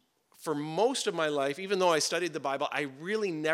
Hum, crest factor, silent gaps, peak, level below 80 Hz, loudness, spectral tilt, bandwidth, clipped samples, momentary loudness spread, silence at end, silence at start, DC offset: none; 18 dB; none; -12 dBFS; under -90 dBFS; -30 LUFS; -3 dB/octave; 16.5 kHz; under 0.1%; 8 LU; 0 s; 0.4 s; under 0.1%